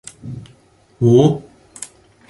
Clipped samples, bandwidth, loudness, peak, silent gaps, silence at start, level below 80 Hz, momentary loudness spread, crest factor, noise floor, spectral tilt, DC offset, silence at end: under 0.1%; 11.5 kHz; -15 LUFS; -2 dBFS; none; 0.25 s; -52 dBFS; 22 LU; 18 dB; -51 dBFS; -7.5 dB/octave; under 0.1%; 0.45 s